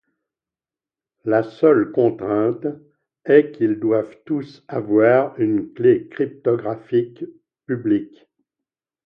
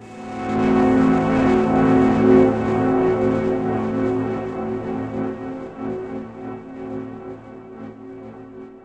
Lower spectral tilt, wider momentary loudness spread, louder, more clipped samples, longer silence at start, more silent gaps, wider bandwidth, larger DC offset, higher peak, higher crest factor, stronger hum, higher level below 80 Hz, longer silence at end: first, -10 dB/octave vs -8.5 dB/octave; second, 14 LU vs 21 LU; about the same, -19 LUFS vs -19 LUFS; neither; first, 1.25 s vs 0 s; neither; second, 5.4 kHz vs 8.4 kHz; neither; about the same, -2 dBFS vs -2 dBFS; about the same, 20 dB vs 18 dB; neither; second, -64 dBFS vs -44 dBFS; first, 1 s vs 0.05 s